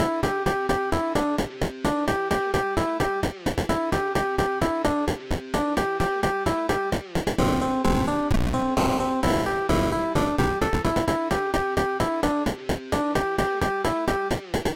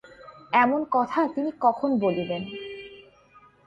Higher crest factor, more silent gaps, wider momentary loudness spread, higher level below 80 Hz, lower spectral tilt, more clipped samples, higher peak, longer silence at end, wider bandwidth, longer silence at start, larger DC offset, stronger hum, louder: second, 12 dB vs 18 dB; neither; second, 4 LU vs 16 LU; first, -36 dBFS vs -66 dBFS; second, -5.5 dB/octave vs -7.5 dB/octave; neither; second, -12 dBFS vs -8 dBFS; second, 0 s vs 0.65 s; first, 17 kHz vs 7.6 kHz; about the same, 0 s vs 0.05 s; neither; neither; about the same, -25 LUFS vs -24 LUFS